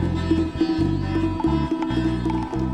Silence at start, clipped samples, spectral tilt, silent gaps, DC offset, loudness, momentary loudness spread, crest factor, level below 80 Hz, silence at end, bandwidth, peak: 0 s; under 0.1%; -8 dB/octave; none; under 0.1%; -23 LUFS; 3 LU; 14 dB; -34 dBFS; 0 s; 9 kHz; -8 dBFS